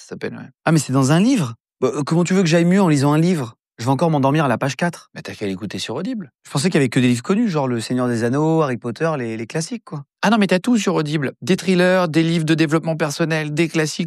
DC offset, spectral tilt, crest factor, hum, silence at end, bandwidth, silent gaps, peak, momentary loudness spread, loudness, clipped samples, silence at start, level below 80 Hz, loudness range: under 0.1%; -6 dB/octave; 16 dB; none; 0 s; 13.5 kHz; 6.35-6.39 s; -2 dBFS; 11 LU; -18 LUFS; under 0.1%; 0 s; -64 dBFS; 3 LU